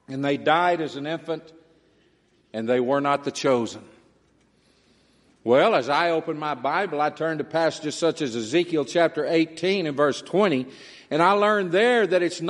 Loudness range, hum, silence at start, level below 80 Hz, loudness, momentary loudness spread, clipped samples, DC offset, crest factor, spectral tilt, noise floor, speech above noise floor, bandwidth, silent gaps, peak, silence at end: 5 LU; none; 0.1 s; -72 dBFS; -23 LUFS; 10 LU; under 0.1%; under 0.1%; 20 dB; -5 dB/octave; -62 dBFS; 40 dB; 11.5 kHz; none; -4 dBFS; 0 s